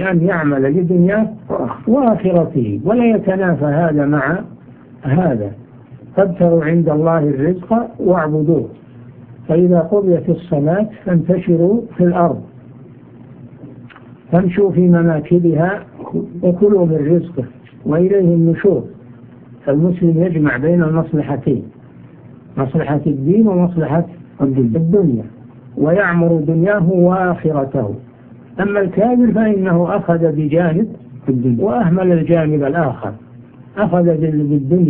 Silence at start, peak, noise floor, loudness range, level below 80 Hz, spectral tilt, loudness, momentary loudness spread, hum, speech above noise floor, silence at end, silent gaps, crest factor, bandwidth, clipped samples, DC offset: 0 s; 0 dBFS; -39 dBFS; 2 LU; -46 dBFS; -13.5 dB/octave; -15 LUFS; 10 LU; none; 25 dB; 0 s; none; 14 dB; 3.5 kHz; under 0.1%; under 0.1%